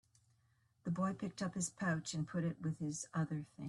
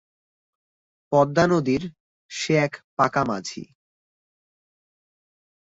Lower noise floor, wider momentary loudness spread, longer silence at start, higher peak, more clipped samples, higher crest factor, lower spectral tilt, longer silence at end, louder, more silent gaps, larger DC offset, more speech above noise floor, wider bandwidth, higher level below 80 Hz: second, -76 dBFS vs under -90 dBFS; second, 4 LU vs 16 LU; second, 0.85 s vs 1.1 s; second, -26 dBFS vs -4 dBFS; neither; second, 16 dB vs 22 dB; about the same, -5.5 dB/octave vs -5.5 dB/octave; second, 0 s vs 2.05 s; second, -41 LUFS vs -22 LUFS; second, none vs 2.00-2.29 s, 2.84-2.97 s; neither; second, 35 dB vs over 68 dB; first, 12 kHz vs 8 kHz; second, -74 dBFS vs -58 dBFS